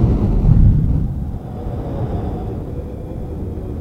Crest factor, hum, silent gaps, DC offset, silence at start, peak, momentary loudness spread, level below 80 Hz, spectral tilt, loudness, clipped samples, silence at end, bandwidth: 16 dB; none; none; under 0.1%; 0 s; 0 dBFS; 14 LU; -20 dBFS; -11 dB/octave; -20 LUFS; under 0.1%; 0 s; 4 kHz